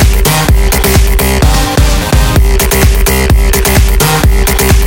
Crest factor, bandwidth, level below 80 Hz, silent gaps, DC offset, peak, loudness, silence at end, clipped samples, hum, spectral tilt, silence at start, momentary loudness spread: 6 dB; 17.5 kHz; -8 dBFS; none; under 0.1%; 0 dBFS; -9 LUFS; 0 s; 0.8%; none; -4.5 dB/octave; 0 s; 1 LU